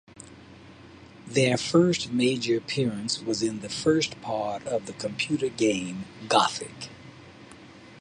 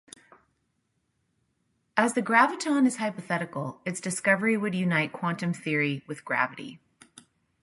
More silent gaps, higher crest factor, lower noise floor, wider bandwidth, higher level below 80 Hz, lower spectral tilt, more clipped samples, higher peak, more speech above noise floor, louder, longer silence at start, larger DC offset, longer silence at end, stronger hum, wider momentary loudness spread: neither; about the same, 22 dB vs 22 dB; second, -48 dBFS vs -75 dBFS; about the same, 11.5 kHz vs 11.5 kHz; first, -62 dBFS vs -74 dBFS; about the same, -4.5 dB/octave vs -5 dB/octave; neither; about the same, -6 dBFS vs -6 dBFS; second, 22 dB vs 49 dB; about the same, -26 LUFS vs -27 LUFS; second, 0.15 s vs 1.95 s; neither; second, 0 s vs 0.85 s; neither; first, 24 LU vs 11 LU